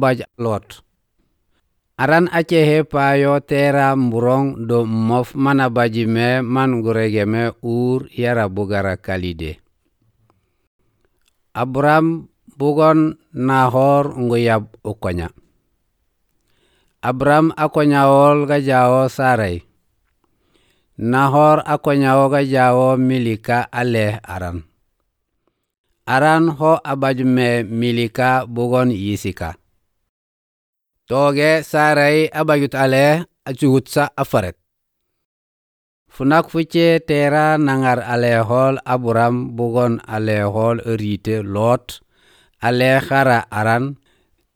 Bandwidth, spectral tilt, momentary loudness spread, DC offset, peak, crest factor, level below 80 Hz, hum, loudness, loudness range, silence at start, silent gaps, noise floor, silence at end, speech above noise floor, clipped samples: 18.5 kHz; -7 dB/octave; 10 LU; under 0.1%; -2 dBFS; 16 dB; -50 dBFS; none; -16 LUFS; 6 LU; 0 s; 10.67-10.79 s, 25.78-25.84 s, 30.09-30.73 s, 35.25-36.06 s; -73 dBFS; 0.6 s; 57 dB; under 0.1%